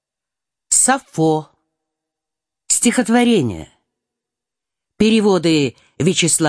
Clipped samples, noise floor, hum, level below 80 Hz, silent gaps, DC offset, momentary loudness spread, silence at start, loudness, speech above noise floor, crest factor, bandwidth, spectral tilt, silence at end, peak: under 0.1%; -85 dBFS; none; -52 dBFS; none; under 0.1%; 9 LU; 0.7 s; -15 LUFS; 70 dB; 18 dB; 11 kHz; -3.5 dB/octave; 0 s; 0 dBFS